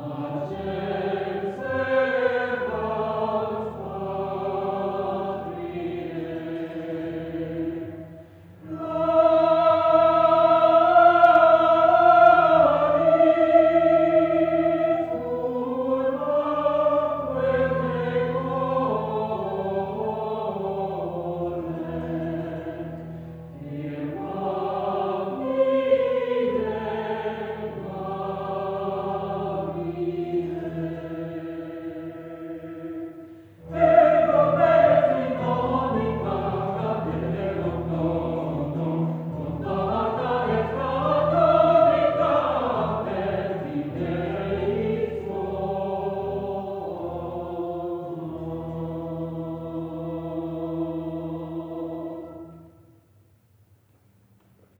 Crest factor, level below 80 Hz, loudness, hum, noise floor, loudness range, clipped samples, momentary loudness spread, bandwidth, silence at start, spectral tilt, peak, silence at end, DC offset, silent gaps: 20 dB; -50 dBFS; -23 LUFS; none; -60 dBFS; 14 LU; under 0.1%; 16 LU; 4.6 kHz; 0 s; -8.5 dB/octave; -4 dBFS; 2.1 s; under 0.1%; none